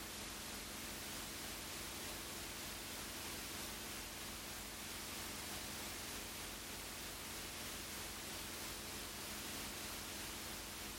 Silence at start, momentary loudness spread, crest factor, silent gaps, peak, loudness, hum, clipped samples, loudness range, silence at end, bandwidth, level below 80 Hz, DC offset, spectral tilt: 0 s; 2 LU; 14 dB; none; -34 dBFS; -46 LUFS; 50 Hz at -70 dBFS; under 0.1%; 0 LU; 0 s; 16.5 kHz; -62 dBFS; under 0.1%; -1.5 dB/octave